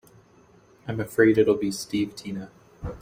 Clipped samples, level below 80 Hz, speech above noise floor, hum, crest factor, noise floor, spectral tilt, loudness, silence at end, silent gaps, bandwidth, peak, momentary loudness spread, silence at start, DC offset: under 0.1%; -52 dBFS; 32 dB; none; 20 dB; -56 dBFS; -6 dB/octave; -24 LUFS; 0.05 s; none; 16 kHz; -6 dBFS; 20 LU; 0.85 s; under 0.1%